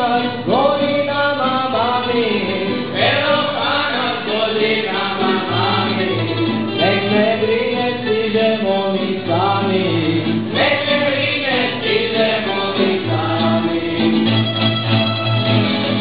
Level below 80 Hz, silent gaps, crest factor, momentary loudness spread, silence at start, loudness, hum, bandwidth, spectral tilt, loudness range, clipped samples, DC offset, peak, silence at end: -52 dBFS; none; 16 dB; 4 LU; 0 s; -17 LUFS; none; 5.2 kHz; -10 dB/octave; 1 LU; under 0.1%; 0.8%; -2 dBFS; 0 s